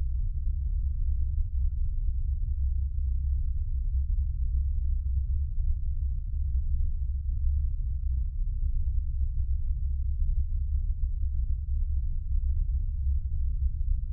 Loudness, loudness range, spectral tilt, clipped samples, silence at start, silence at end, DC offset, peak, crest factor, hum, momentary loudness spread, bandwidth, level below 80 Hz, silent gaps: -32 LUFS; 1 LU; -12.5 dB/octave; under 0.1%; 0 s; 0 s; under 0.1%; -16 dBFS; 12 dB; none; 2 LU; 0.3 kHz; -28 dBFS; none